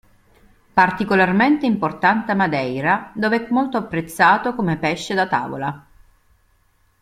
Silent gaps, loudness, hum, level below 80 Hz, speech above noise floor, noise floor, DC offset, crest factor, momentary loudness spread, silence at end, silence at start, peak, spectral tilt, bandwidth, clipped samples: none; -19 LUFS; none; -54 dBFS; 41 dB; -60 dBFS; under 0.1%; 18 dB; 8 LU; 1.2 s; 0.75 s; -2 dBFS; -6 dB/octave; 15 kHz; under 0.1%